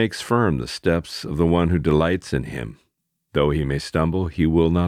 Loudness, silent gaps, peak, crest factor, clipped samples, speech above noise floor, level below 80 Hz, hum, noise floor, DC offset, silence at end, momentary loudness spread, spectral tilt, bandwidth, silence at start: -21 LUFS; none; -4 dBFS; 16 dB; under 0.1%; 52 dB; -36 dBFS; none; -73 dBFS; under 0.1%; 0 s; 9 LU; -7 dB/octave; 14 kHz; 0 s